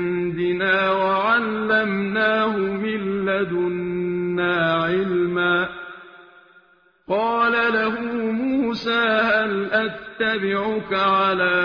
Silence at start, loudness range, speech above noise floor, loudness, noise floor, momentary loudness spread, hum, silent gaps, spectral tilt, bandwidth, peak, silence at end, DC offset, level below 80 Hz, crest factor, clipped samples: 0 s; 3 LU; 36 dB; -21 LUFS; -56 dBFS; 6 LU; none; none; -7 dB/octave; 5.4 kHz; -6 dBFS; 0 s; under 0.1%; -56 dBFS; 14 dB; under 0.1%